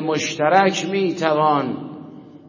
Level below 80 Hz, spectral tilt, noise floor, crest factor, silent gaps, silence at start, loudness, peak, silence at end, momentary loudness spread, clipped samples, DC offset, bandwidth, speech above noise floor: -66 dBFS; -4.5 dB/octave; -39 dBFS; 20 dB; none; 0 s; -19 LUFS; 0 dBFS; 0.1 s; 16 LU; under 0.1%; under 0.1%; 7.4 kHz; 21 dB